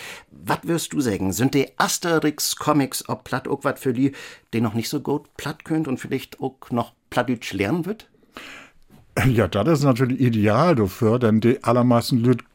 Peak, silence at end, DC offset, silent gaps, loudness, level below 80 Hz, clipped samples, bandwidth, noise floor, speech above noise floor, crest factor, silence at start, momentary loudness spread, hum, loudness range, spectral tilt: -4 dBFS; 0.15 s; under 0.1%; none; -22 LUFS; -52 dBFS; under 0.1%; 17 kHz; -51 dBFS; 30 dB; 18 dB; 0 s; 13 LU; none; 8 LU; -5.5 dB/octave